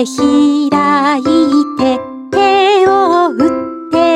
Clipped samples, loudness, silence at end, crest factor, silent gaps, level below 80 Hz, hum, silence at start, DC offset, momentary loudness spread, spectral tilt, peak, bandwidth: under 0.1%; -11 LUFS; 0 s; 10 dB; none; -48 dBFS; none; 0 s; under 0.1%; 7 LU; -4.5 dB/octave; 0 dBFS; 11.5 kHz